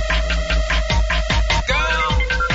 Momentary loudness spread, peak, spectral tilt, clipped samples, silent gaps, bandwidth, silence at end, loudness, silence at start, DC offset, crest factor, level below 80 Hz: 2 LU; -6 dBFS; -4 dB/octave; under 0.1%; none; 8 kHz; 0 s; -19 LUFS; 0 s; under 0.1%; 12 dB; -20 dBFS